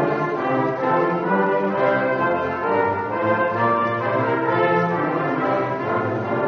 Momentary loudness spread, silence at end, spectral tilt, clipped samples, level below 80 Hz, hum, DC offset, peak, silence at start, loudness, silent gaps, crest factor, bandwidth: 3 LU; 0 s; -5.5 dB/octave; under 0.1%; -60 dBFS; none; under 0.1%; -6 dBFS; 0 s; -21 LUFS; none; 14 dB; 6.6 kHz